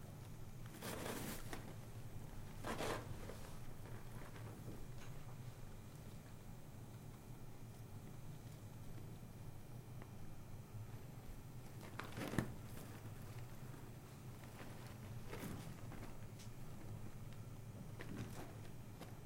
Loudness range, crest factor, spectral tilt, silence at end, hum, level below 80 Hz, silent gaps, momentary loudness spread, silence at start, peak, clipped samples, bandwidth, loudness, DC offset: 6 LU; 30 dB; -5.5 dB/octave; 0 s; none; -58 dBFS; none; 10 LU; 0 s; -20 dBFS; under 0.1%; 16.5 kHz; -53 LUFS; under 0.1%